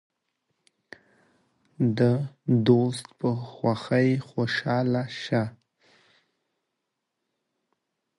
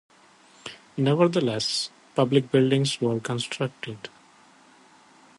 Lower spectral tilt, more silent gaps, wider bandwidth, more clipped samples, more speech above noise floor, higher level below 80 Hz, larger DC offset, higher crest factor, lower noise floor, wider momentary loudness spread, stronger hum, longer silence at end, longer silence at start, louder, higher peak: first, -7.5 dB/octave vs -5.5 dB/octave; neither; about the same, 11.5 kHz vs 11.5 kHz; neither; first, 57 dB vs 32 dB; about the same, -66 dBFS vs -68 dBFS; neither; about the same, 22 dB vs 20 dB; first, -82 dBFS vs -55 dBFS; second, 8 LU vs 20 LU; neither; first, 2.7 s vs 1.3 s; first, 1.8 s vs 0.65 s; about the same, -25 LUFS vs -24 LUFS; about the same, -6 dBFS vs -6 dBFS